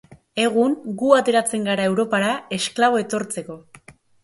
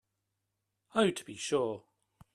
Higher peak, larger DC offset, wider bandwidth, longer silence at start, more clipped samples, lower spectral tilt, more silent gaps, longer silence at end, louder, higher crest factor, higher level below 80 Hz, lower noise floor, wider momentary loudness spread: first, 0 dBFS vs -14 dBFS; neither; about the same, 12 kHz vs 13 kHz; second, 0.1 s vs 0.95 s; neither; about the same, -4 dB/octave vs -4 dB/octave; neither; second, 0.3 s vs 0.55 s; first, -20 LUFS vs -33 LUFS; about the same, 20 dB vs 20 dB; first, -64 dBFS vs -74 dBFS; second, -49 dBFS vs -84 dBFS; first, 13 LU vs 9 LU